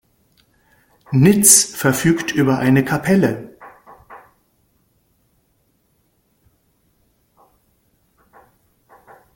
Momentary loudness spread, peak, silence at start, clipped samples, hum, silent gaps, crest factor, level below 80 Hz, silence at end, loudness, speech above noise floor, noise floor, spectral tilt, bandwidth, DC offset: 12 LU; 0 dBFS; 1.1 s; under 0.1%; none; none; 20 dB; -54 dBFS; 5.2 s; -14 LUFS; 49 dB; -63 dBFS; -4 dB/octave; 17 kHz; under 0.1%